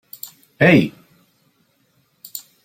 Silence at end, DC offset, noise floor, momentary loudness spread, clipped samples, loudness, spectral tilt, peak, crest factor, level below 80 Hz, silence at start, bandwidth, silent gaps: 0.25 s; under 0.1%; -63 dBFS; 22 LU; under 0.1%; -15 LUFS; -6.5 dB/octave; -2 dBFS; 20 dB; -56 dBFS; 0.25 s; 16.5 kHz; none